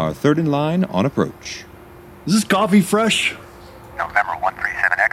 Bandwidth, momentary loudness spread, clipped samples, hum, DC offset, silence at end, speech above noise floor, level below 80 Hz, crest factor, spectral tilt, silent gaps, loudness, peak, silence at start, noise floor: 15.5 kHz; 16 LU; under 0.1%; none; under 0.1%; 0.05 s; 23 dB; -50 dBFS; 16 dB; -5 dB/octave; none; -18 LUFS; -4 dBFS; 0 s; -41 dBFS